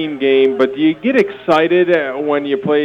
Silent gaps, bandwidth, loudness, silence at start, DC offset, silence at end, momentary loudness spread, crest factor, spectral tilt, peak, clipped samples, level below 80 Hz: none; 7.4 kHz; -14 LUFS; 0 s; under 0.1%; 0 s; 5 LU; 12 dB; -7 dB/octave; -2 dBFS; under 0.1%; -58 dBFS